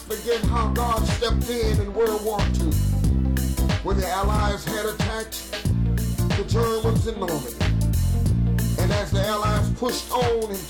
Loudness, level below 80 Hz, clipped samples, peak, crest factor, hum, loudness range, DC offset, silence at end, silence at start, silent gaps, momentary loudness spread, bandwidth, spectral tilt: -23 LUFS; -28 dBFS; under 0.1%; -14 dBFS; 8 dB; none; 1 LU; under 0.1%; 0 s; 0 s; none; 4 LU; 19.5 kHz; -5.5 dB/octave